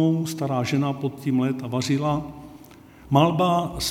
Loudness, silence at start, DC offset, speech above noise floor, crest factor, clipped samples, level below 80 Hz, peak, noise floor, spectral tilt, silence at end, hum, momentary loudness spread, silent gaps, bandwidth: -23 LUFS; 0 s; under 0.1%; 24 dB; 20 dB; under 0.1%; -50 dBFS; -4 dBFS; -47 dBFS; -6 dB/octave; 0 s; none; 8 LU; none; 17 kHz